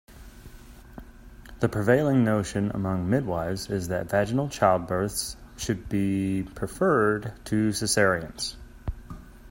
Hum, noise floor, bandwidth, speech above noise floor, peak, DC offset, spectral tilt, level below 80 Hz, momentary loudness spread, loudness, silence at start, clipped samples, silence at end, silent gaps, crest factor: none; -46 dBFS; 16.5 kHz; 21 dB; -6 dBFS; under 0.1%; -5.5 dB/octave; -46 dBFS; 16 LU; -26 LUFS; 0.1 s; under 0.1%; 0 s; none; 20 dB